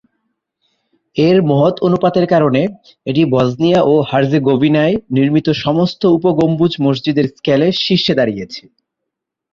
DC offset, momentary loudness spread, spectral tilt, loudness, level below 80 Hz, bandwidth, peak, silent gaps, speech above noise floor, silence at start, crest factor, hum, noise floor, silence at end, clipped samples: under 0.1%; 5 LU; -7.5 dB/octave; -13 LUFS; -50 dBFS; 7.2 kHz; -2 dBFS; none; 66 dB; 1.15 s; 12 dB; none; -79 dBFS; 0.95 s; under 0.1%